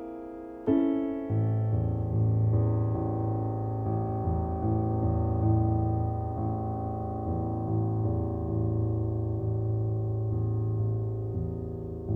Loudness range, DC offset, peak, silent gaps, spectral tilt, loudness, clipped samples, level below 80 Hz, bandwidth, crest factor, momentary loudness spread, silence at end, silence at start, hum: 2 LU; under 0.1%; -14 dBFS; none; -12.5 dB/octave; -29 LUFS; under 0.1%; -42 dBFS; 3 kHz; 14 dB; 7 LU; 0 s; 0 s; none